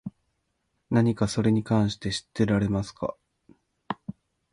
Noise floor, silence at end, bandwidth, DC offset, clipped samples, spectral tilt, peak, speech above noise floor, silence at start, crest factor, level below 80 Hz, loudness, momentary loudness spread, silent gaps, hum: -76 dBFS; 0.4 s; 11 kHz; under 0.1%; under 0.1%; -6.5 dB/octave; -10 dBFS; 51 dB; 0.05 s; 18 dB; -52 dBFS; -26 LUFS; 13 LU; none; none